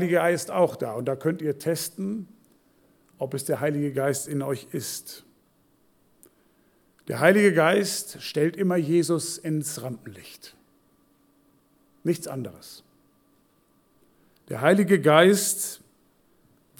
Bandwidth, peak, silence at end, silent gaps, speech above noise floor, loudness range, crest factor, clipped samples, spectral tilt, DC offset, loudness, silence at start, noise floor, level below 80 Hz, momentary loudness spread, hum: 19 kHz; -2 dBFS; 1.05 s; none; 40 dB; 13 LU; 24 dB; under 0.1%; -4.5 dB/octave; under 0.1%; -24 LUFS; 0 s; -64 dBFS; -76 dBFS; 22 LU; none